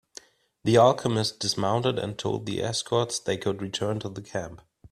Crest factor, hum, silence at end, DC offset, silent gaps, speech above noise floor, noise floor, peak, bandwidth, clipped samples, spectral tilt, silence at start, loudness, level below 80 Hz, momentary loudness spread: 20 dB; none; 0.05 s; under 0.1%; none; 25 dB; -51 dBFS; -6 dBFS; 13.5 kHz; under 0.1%; -4.5 dB/octave; 0.65 s; -26 LUFS; -60 dBFS; 15 LU